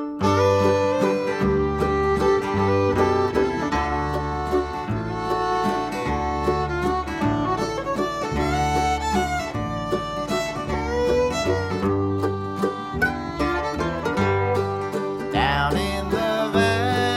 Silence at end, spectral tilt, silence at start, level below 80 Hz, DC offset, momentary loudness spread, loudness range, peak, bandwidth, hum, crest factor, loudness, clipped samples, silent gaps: 0 s; -6 dB/octave; 0 s; -36 dBFS; under 0.1%; 6 LU; 3 LU; -6 dBFS; 15.5 kHz; none; 16 dB; -23 LUFS; under 0.1%; none